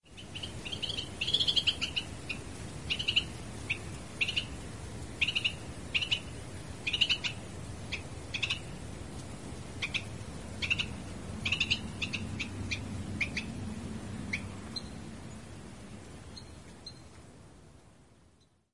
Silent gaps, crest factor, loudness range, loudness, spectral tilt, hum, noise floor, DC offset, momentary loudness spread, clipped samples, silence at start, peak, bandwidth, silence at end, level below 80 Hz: none; 24 dB; 12 LU; -34 LUFS; -3 dB/octave; none; -65 dBFS; 0.2%; 19 LU; under 0.1%; 0 s; -14 dBFS; 11.5 kHz; 0 s; -52 dBFS